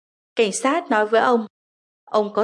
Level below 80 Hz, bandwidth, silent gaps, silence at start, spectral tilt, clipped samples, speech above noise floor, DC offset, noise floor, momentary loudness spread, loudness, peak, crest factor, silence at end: -80 dBFS; 11.5 kHz; 1.50-2.07 s; 0.35 s; -3.5 dB/octave; under 0.1%; over 71 dB; under 0.1%; under -90 dBFS; 8 LU; -20 LUFS; -6 dBFS; 16 dB; 0 s